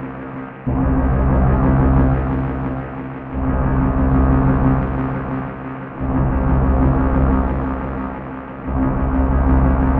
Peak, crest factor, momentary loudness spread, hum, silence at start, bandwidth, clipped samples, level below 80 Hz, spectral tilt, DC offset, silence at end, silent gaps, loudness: -4 dBFS; 14 dB; 12 LU; none; 0 s; 3.3 kHz; under 0.1%; -20 dBFS; -12.5 dB/octave; under 0.1%; 0 s; none; -18 LUFS